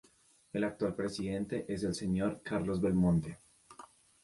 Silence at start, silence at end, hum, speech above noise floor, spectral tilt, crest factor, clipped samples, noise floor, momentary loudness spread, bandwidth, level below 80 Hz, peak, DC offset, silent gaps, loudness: 0.55 s; 0.4 s; none; 33 dB; -7 dB/octave; 16 dB; under 0.1%; -66 dBFS; 21 LU; 11.5 kHz; -56 dBFS; -18 dBFS; under 0.1%; none; -34 LUFS